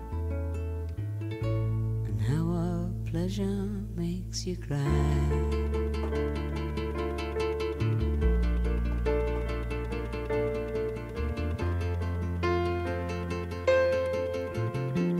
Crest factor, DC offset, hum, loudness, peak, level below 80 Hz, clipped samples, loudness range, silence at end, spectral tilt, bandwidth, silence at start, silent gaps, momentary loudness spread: 16 dB; under 0.1%; none; -31 LUFS; -14 dBFS; -34 dBFS; under 0.1%; 2 LU; 0 s; -7 dB/octave; 14 kHz; 0 s; none; 7 LU